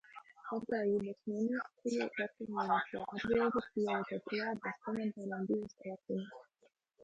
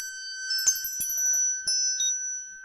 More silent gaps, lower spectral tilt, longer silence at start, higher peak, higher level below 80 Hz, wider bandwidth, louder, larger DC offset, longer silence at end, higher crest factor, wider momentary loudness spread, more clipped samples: neither; first, -6.5 dB/octave vs 4.5 dB/octave; about the same, 0.05 s vs 0 s; second, -20 dBFS vs -10 dBFS; second, -72 dBFS vs -66 dBFS; second, 9 kHz vs 16 kHz; second, -38 LUFS vs -24 LUFS; neither; about the same, 0 s vs 0 s; about the same, 18 dB vs 18 dB; about the same, 8 LU vs 9 LU; neither